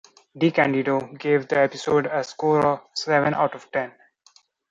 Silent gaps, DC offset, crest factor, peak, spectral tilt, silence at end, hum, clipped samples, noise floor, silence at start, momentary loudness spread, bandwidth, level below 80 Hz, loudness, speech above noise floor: none; under 0.1%; 18 dB; -6 dBFS; -6 dB/octave; 0.8 s; none; under 0.1%; -58 dBFS; 0.35 s; 8 LU; 7.8 kHz; -64 dBFS; -22 LUFS; 36 dB